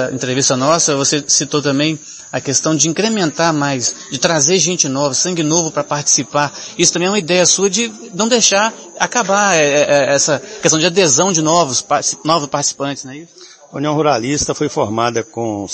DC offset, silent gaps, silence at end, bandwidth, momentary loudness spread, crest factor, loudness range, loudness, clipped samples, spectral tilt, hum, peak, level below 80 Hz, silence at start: under 0.1%; none; 0 s; 11 kHz; 9 LU; 16 dB; 4 LU; -14 LUFS; under 0.1%; -2.5 dB/octave; none; 0 dBFS; -54 dBFS; 0 s